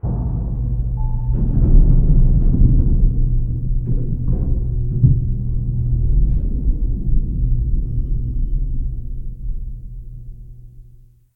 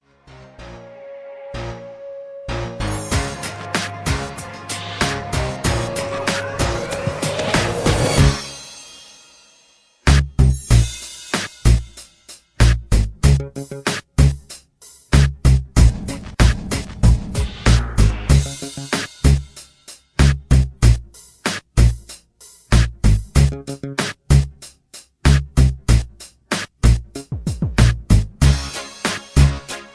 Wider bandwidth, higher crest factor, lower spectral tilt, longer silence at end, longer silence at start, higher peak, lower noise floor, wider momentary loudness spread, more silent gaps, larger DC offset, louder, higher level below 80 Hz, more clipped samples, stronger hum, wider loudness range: second, 1.2 kHz vs 11 kHz; about the same, 16 dB vs 18 dB; first, -14 dB/octave vs -5 dB/octave; first, 0.55 s vs 0.1 s; second, 0.05 s vs 0.6 s; about the same, 0 dBFS vs 0 dBFS; second, -45 dBFS vs -55 dBFS; second, 15 LU vs 18 LU; neither; neither; about the same, -20 LUFS vs -19 LUFS; about the same, -18 dBFS vs -22 dBFS; neither; neither; first, 8 LU vs 5 LU